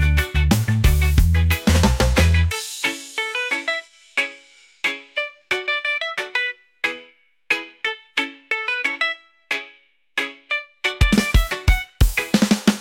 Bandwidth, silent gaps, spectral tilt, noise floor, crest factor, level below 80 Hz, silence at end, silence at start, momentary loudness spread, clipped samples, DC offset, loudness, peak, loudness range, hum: 17 kHz; none; -4.5 dB/octave; -52 dBFS; 16 dB; -26 dBFS; 0 s; 0 s; 9 LU; under 0.1%; under 0.1%; -21 LUFS; -4 dBFS; 6 LU; none